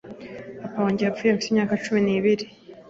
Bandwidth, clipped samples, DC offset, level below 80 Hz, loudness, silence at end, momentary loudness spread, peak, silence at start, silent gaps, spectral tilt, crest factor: 7.8 kHz; under 0.1%; under 0.1%; -62 dBFS; -23 LUFS; 0 s; 17 LU; -8 dBFS; 0.05 s; none; -6 dB/octave; 16 dB